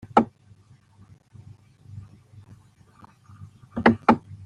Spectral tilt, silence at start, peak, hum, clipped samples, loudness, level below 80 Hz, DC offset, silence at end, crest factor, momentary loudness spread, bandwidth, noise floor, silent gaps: -7.5 dB/octave; 0.15 s; -2 dBFS; none; under 0.1%; -22 LUFS; -58 dBFS; under 0.1%; 0.1 s; 26 dB; 28 LU; 9.8 kHz; -54 dBFS; none